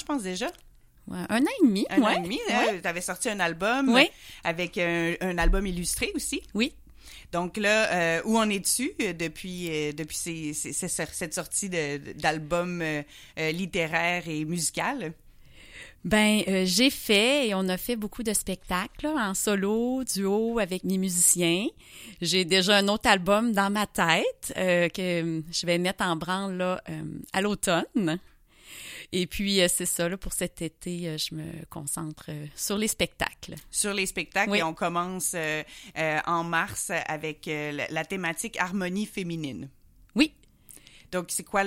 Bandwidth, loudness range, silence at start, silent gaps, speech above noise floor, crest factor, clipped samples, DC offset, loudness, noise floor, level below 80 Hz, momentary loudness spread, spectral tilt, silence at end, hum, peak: 16.5 kHz; 6 LU; 0 s; none; 26 dB; 24 dB; under 0.1%; under 0.1%; -27 LUFS; -53 dBFS; -44 dBFS; 12 LU; -3.5 dB/octave; 0 s; none; -4 dBFS